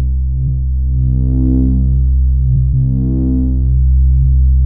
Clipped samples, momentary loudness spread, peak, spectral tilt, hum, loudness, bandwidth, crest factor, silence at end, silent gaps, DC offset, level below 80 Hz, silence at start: under 0.1%; 5 LU; -4 dBFS; -18 dB/octave; none; -14 LUFS; 0.9 kHz; 8 dB; 0 s; none; 4%; -12 dBFS; 0 s